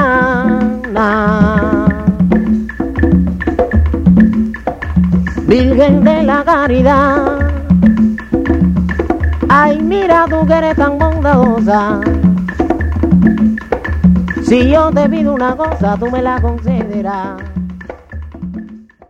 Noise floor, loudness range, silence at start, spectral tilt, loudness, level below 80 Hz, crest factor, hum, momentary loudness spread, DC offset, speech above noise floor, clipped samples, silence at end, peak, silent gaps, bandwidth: -32 dBFS; 3 LU; 0 s; -8.5 dB/octave; -12 LUFS; -22 dBFS; 12 dB; none; 9 LU; under 0.1%; 21 dB; 0.4%; 0.3 s; 0 dBFS; none; 7.8 kHz